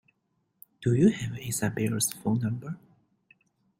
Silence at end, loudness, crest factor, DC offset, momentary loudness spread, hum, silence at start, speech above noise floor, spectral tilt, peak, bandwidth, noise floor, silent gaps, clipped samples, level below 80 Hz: 1.05 s; -28 LUFS; 20 dB; under 0.1%; 13 LU; none; 0.8 s; 49 dB; -5.5 dB/octave; -10 dBFS; 16.5 kHz; -76 dBFS; none; under 0.1%; -60 dBFS